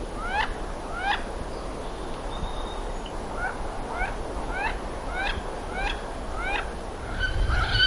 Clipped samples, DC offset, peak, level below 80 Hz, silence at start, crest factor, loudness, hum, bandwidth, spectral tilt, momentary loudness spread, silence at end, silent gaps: under 0.1%; under 0.1%; -10 dBFS; -34 dBFS; 0 s; 18 dB; -31 LUFS; none; 11.5 kHz; -4 dB/octave; 7 LU; 0 s; none